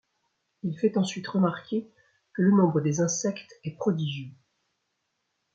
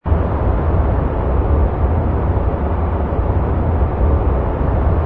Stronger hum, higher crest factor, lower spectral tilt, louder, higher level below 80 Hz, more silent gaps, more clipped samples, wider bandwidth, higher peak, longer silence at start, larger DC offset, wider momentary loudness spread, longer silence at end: neither; about the same, 18 dB vs 14 dB; second, -6 dB/octave vs -12 dB/octave; second, -27 LUFS vs -18 LUFS; second, -72 dBFS vs -18 dBFS; neither; neither; first, 7.8 kHz vs 3.7 kHz; second, -10 dBFS vs -2 dBFS; first, 0.65 s vs 0.05 s; neither; first, 16 LU vs 2 LU; first, 1.25 s vs 0 s